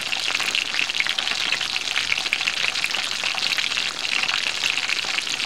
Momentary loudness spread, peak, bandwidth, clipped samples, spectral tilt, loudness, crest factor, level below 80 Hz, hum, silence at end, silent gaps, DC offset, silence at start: 2 LU; -4 dBFS; 17 kHz; under 0.1%; 1 dB/octave; -21 LUFS; 20 dB; -60 dBFS; none; 0 s; none; 0.6%; 0 s